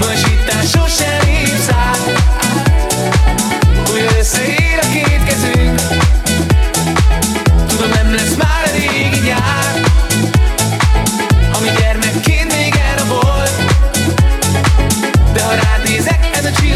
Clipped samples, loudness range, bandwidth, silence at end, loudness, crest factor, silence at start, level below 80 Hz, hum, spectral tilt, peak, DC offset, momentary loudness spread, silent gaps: under 0.1%; 0 LU; 15.5 kHz; 0 s; -12 LUFS; 10 dB; 0 s; -16 dBFS; none; -4 dB/octave; 0 dBFS; under 0.1%; 1 LU; none